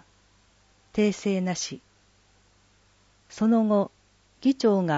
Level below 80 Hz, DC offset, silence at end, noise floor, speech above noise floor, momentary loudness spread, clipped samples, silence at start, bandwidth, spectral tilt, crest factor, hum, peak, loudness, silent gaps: -64 dBFS; under 0.1%; 0 s; -62 dBFS; 38 dB; 12 LU; under 0.1%; 0.95 s; 8 kHz; -6 dB/octave; 16 dB; 50 Hz at -55 dBFS; -12 dBFS; -25 LUFS; none